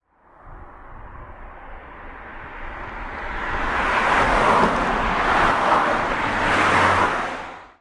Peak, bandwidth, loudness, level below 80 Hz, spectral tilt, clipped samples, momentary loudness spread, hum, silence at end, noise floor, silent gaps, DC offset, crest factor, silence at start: -4 dBFS; 11.5 kHz; -19 LUFS; -36 dBFS; -4.5 dB/octave; under 0.1%; 24 LU; none; 0.15 s; -48 dBFS; none; under 0.1%; 18 dB; 0.45 s